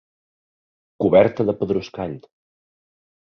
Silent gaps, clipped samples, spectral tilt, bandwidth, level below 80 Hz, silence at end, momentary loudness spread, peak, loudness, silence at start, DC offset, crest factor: none; under 0.1%; -8 dB/octave; 6.4 kHz; -54 dBFS; 1.1 s; 15 LU; -2 dBFS; -19 LUFS; 1 s; under 0.1%; 20 dB